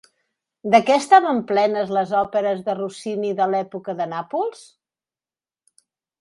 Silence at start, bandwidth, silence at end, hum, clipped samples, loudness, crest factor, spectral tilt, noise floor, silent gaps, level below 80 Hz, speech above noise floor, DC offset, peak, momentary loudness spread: 0.65 s; 11.5 kHz; 1.7 s; none; under 0.1%; -20 LUFS; 22 dB; -5 dB/octave; under -90 dBFS; none; -66 dBFS; over 70 dB; under 0.1%; 0 dBFS; 12 LU